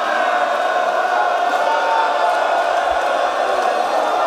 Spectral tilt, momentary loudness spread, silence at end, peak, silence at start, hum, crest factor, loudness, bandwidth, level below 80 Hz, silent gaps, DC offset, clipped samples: -1.5 dB/octave; 1 LU; 0 s; -4 dBFS; 0 s; none; 12 dB; -17 LUFS; 15 kHz; -56 dBFS; none; under 0.1%; under 0.1%